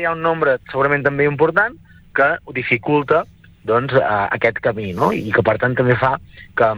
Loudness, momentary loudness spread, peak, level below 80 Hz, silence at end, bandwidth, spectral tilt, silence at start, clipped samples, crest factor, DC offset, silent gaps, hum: -17 LUFS; 6 LU; -2 dBFS; -48 dBFS; 0 s; 12.5 kHz; -8 dB/octave; 0 s; under 0.1%; 16 dB; under 0.1%; none; none